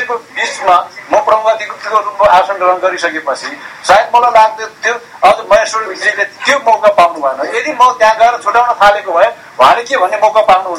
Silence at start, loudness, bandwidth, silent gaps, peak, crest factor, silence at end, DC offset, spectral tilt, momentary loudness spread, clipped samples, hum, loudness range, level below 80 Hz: 0 s; -10 LUFS; 15.5 kHz; none; 0 dBFS; 10 dB; 0 s; under 0.1%; -2 dB/octave; 8 LU; 0.9%; none; 2 LU; -46 dBFS